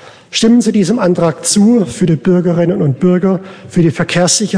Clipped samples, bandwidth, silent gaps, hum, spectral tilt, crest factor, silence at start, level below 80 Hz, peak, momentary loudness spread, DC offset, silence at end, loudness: under 0.1%; 10.5 kHz; none; none; -5 dB/octave; 12 dB; 0.05 s; -44 dBFS; 0 dBFS; 4 LU; 0.2%; 0 s; -12 LUFS